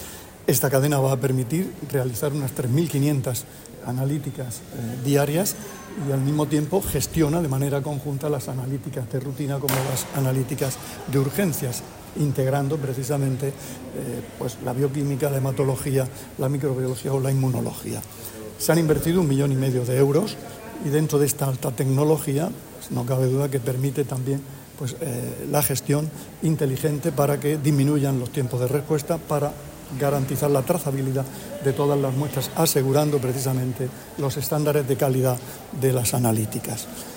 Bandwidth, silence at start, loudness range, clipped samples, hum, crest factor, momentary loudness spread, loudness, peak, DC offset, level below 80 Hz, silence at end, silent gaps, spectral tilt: 16.5 kHz; 0 s; 3 LU; under 0.1%; none; 18 dB; 11 LU; -24 LUFS; -4 dBFS; under 0.1%; -50 dBFS; 0 s; none; -6 dB/octave